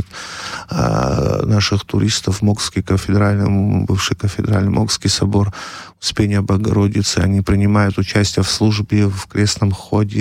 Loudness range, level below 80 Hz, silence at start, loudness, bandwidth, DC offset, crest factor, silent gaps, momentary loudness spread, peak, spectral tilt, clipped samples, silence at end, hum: 1 LU; -36 dBFS; 0 s; -16 LUFS; 13.5 kHz; under 0.1%; 12 dB; none; 5 LU; -4 dBFS; -5.5 dB/octave; under 0.1%; 0 s; none